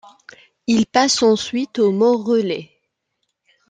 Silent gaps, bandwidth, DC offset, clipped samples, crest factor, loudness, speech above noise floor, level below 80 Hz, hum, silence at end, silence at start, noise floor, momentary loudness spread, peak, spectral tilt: none; 9.4 kHz; under 0.1%; under 0.1%; 18 dB; -17 LUFS; 57 dB; -62 dBFS; none; 1.05 s; 0.7 s; -74 dBFS; 10 LU; -2 dBFS; -4 dB/octave